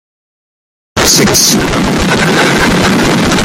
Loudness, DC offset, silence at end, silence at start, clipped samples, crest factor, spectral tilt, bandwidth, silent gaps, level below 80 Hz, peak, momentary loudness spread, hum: -8 LUFS; under 0.1%; 0 s; 0.95 s; 0.1%; 10 dB; -3 dB/octave; over 20 kHz; none; -28 dBFS; 0 dBFS; 5 LU; none